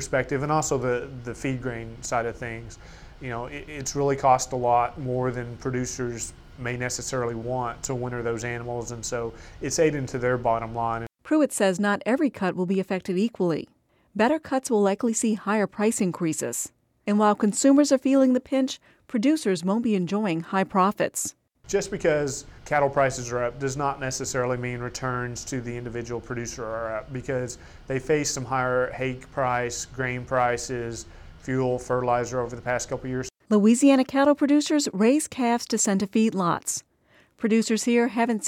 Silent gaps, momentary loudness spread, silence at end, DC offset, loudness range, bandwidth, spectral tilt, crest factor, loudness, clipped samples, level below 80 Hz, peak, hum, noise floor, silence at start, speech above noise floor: none; 12 LU; 0 s; under 0.1%; 7 LU; 16 kHz; -5 dB/octave; 18 dB; -25 LUFS; under 0.1%; -50 dBFS; -6 dBFS; none; -60 dBFS; 0 s; 36 dB